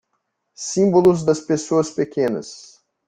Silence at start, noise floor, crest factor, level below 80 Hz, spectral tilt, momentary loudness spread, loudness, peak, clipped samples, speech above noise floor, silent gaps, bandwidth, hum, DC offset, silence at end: 0.6 s; -73 dBFS; 18 dB; -56 dBFS; -6 dB/octave; 14 LU; -19 LUFS; -2 dBFS; under 0.1%; 55 dB; none; 9.6 kHz; none; under 0.1%; 0.45 s